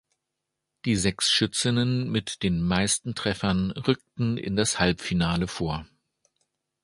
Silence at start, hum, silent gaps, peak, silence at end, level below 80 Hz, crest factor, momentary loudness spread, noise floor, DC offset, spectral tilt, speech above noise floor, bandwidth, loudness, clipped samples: 0.85 s; none; none; -6 dBFS; 1 s; -46 dBFS; 22 dB; 7 LU; -83 dBFS; under 0.1%; -4 dB/octave; 58 dB; 11.5 kHz; -25 LUFS; under 0.1%